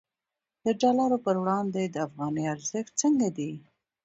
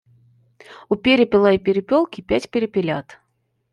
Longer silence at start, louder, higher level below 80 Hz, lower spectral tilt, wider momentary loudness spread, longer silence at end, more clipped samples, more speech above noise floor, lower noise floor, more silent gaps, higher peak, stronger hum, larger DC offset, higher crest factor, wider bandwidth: about the same, 0.65 s vs 0.7 s; second, -28 LUFS vs -19 LUFS; second, -72 dBFS vs -52 dBFS; second, -5 dB/octave vs -6.5 dB/octave; about the same, 9 LU vs 10 LU; second, 0.45 s vs 0.6 s; neither; first, 62 dB vs 52 dB; first, -89 dBFS vs -70 dBFS; neither; second, -12 dBFS vs -4 dBFS; neither; neither; about the same, 16 dB vs 16 dB; second, 8.2 kHz vs 11 kHz